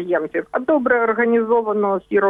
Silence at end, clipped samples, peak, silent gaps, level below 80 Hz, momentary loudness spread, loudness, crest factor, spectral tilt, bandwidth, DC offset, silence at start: 0 s; under 0.1%; -4 dBFS; none; -60 dBFS; 5 LU; -18 LUFS; 14 dB; -9 dB/octave; 3.8 kHz; under 0.1%; 0 s